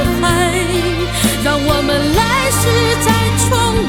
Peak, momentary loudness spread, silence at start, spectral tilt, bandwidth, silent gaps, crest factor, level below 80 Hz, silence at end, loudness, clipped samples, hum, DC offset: -2 dBFS; 3 LU; 0 s; -4 dB/octave; 19.5 kHz; none; 12 dB; -26 dBFS; 0 s; -14 LUFS; under 0.1%; none; 0.5%